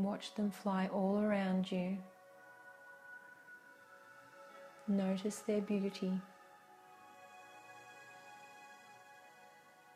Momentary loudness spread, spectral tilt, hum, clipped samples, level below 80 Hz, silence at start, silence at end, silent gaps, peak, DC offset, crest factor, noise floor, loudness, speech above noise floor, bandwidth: 23 LU; -6.5 dB/octave; none; under 0.1%; -82 dBFS; 0 s; 0.45 s; none; -22 dBFS; under 0.1%; 18 dB; -62 dBFS; -38 LUFS; 25 dB; 14.5 kHz